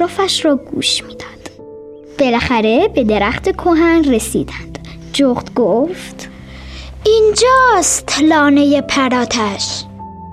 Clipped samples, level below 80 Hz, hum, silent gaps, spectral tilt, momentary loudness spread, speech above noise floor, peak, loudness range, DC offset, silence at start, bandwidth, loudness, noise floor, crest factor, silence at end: under 0.1%; -36 dBFS; none; none; -3.5 dB/octave; 21 LU; 21 dB; -2 dBFS; 4 LU; under 0.1%; 0 s; 14.5 kHz; -13 LUFS; -34 dBFS; 12 dB; 0 s